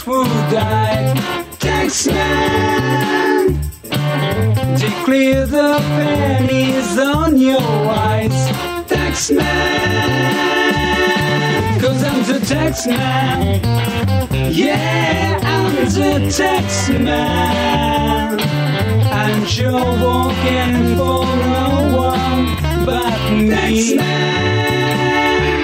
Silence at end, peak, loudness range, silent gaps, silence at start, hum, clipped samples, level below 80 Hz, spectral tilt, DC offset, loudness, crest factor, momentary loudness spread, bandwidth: 0 s; -4 dBFS; 1 LU; none; 0 s; none; under 0.1%; -30 dBFS; -5 dB/octave; under 0.1%; -15 LUFS; 12 dB; 3 LU; 16.5 kHz